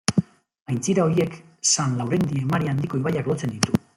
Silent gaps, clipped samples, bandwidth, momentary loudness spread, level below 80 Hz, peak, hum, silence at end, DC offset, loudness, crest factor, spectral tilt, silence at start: 0.62-0.66 s; under 0.1%; 15.5 kHz; 6 LU; -56 dBFS; 0 dBFS; none; 0.2 s; under 0.1%; -23 LUFS; 24 dB; -4.5 dB/octave; 0.1 s